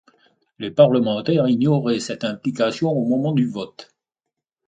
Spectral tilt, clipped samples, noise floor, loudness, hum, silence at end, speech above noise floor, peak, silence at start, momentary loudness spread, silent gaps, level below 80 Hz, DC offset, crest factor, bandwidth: -7 dB/octave; under 0.1%; -83 dBFS; -20 LUFS; none; 0.85 s; 64 dB; -2 dBFS; 0.6 s; 11 LU; none; -64 dBFS; under 0.1%; 20 dB; 9.2 kHz